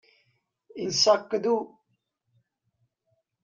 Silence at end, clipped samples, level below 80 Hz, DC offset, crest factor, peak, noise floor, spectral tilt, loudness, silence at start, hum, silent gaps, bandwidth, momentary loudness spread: 1.75 s; under 0.1%; -74 dBFS; under 0.1%; 22 dB; -8 dBFS; -76 dBFS; -2.5 dB/octave; -25 LUFS; 0.75 s; none; none; 9 kHz; 20 LU